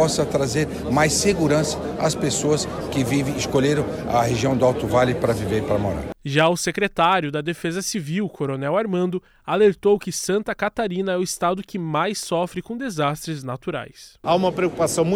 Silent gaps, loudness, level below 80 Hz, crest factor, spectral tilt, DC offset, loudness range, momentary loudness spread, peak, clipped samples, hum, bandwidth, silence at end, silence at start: none; -22 LUFS; -44 dBFS; 16 dB; -5 dB/octave; under 0.1%; 4 LU; 8 LU; -6 dBFS; under 0.1%; none; 17 kHz; 0 s; 0 s